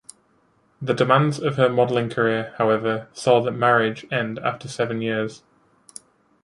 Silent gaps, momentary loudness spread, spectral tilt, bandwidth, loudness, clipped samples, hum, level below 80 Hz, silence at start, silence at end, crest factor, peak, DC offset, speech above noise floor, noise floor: none; 9 LU; -6 dB/octave; 11.5 kHz; -21 LUFS; under 0.1%; none; -64 dBFS; 0.8 s; 1.05 s; 18 dB; -4 dBFS; under 0.1%; 41 dB; -62 dBFS